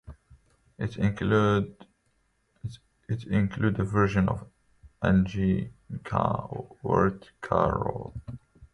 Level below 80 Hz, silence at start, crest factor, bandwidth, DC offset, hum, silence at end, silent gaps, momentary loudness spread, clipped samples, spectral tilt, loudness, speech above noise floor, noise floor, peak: -46 dBFS; 0.05 s; 20 dB; 9 kHz; under 0.1%; none; 0.1 s; none; 17 LU; under 0.1%; -8.5 dB/octave; -27 LUFS; 45 dB; -71 dBFS; -8 dBFS